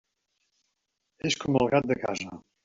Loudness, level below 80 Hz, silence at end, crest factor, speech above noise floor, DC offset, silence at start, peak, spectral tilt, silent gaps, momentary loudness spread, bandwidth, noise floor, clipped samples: -27 LUFS; -60 dBFS; 0.25 s; 22 dB; 53 dB; under 0.1%; 1.25 s; -8 dBFS; -4.5 dB/octave; none; 11 LU; 7.8 kHz; -80 dBFS; under 0.1%